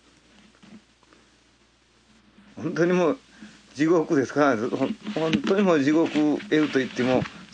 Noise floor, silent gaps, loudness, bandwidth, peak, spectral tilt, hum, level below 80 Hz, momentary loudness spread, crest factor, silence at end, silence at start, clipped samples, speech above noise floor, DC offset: -60 dBFS; none; -23 LUFS; 9.2 kHz; -6 dBFS; -6 dB/octave; none; -64 dBFS; 7 LU; 18 dB; 0.1 s; 0.7 s; under 0.1%; 38 dB; under 0.1%